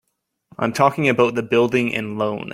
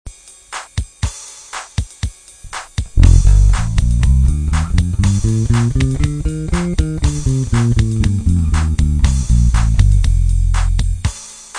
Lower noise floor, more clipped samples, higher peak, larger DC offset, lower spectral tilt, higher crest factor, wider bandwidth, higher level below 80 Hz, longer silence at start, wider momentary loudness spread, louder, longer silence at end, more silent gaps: first, -66 dBFS vs -34 dBFS; neither; about the same, -2 dBFS vs 0 dBFS; neither; about the same, -6 dB/octave vs -6 dB/octave; about the same, 18 dB vs 14 dB; first, 16 kHz vs 10.5 kHz; second, -58 dBFS vs -16 dBFS; first, 0.6 s vs 0.05 s; second, 7 LU vs 13 LU; second, -19 LUFS vs -16 LUFS; about the same, 0 s vs 0 s; neither